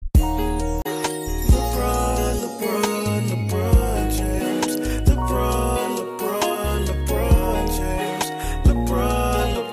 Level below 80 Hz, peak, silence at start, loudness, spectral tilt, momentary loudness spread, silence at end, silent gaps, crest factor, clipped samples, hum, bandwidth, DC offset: -24 dBFS; -6 dBFS; 0 s; -22 LUFS; -5.5 dB/octave; 6 LU; 0 s; none; 14 dB; under 0.1%; none; 15.5 kHz; under 0.1%